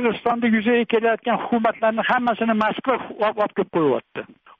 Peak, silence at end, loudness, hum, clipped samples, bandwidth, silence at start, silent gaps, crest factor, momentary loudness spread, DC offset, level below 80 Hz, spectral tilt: -8 dBFS; 0.35 s; -21 LUFS; none; under 0.1%; 5.2 kHz; 0 s; none; 14 dB; 5 LU; under 0.1%; -62 dBFS; -3.5 dB/octave